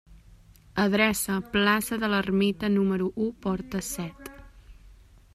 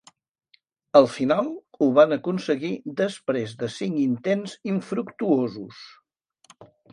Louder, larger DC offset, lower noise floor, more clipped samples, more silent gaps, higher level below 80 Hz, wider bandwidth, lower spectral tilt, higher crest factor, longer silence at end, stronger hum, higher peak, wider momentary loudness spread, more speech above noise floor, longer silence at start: second, -26 LUFS vs -23 LUFS; neither; second, -53 dBFS vs -64 dBFS; neither; neither; first, -52 dBFS vs -70 dBFS; first, 15.5 kHz vs 10.5 kHz; second, -4.5 dB/octave vs -6.5 dB/octave; about the same, 20 dB vs 22 dB; first, 0.45 s vs 0.3 s; neither; second, -8 dBFS vs -2 dBFS; about the same, 12 LU vs 12 LU; second, 28 dB vs 42 dB; second, 0.1 s vs 0.95 s